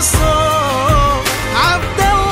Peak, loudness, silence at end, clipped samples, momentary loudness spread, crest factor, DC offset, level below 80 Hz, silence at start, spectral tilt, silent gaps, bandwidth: 0 dBFS; -13 LUFS; 0 s; under 0.1%; 2 LU; 12 dB; under 0.1%; -22 dBFS; 0 s; -3.5 dB/octave; none; 16.5 kHz